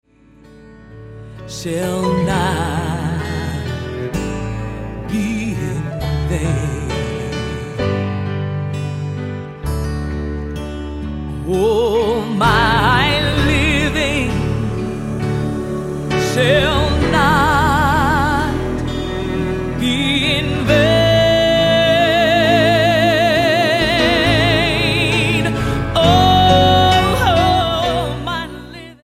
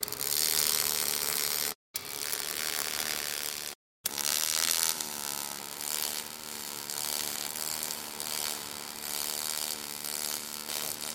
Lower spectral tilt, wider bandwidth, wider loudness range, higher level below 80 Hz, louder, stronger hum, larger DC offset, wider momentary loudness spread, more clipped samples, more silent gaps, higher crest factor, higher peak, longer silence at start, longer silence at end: first, -5.5 dB/octave vs 1 dB/octave; about the same, 16 kHz vs 17 kHz; first, 9 LU vs 4 LU; first, -28 dBFS vs -68 dBFS; first, -16 LUFS vs -31 LUFS; neither; neither; about the same, 12 LU vs 10 LU; neither; second, none vs 1.75-1.94 s, 3.75-4.04 s; second, 16 dB vs 32 dB; about the same, 0 dBFS vs -2 dBFS; first, 0.55 s vs 0 s; about the same, 0.1 s vs 0 s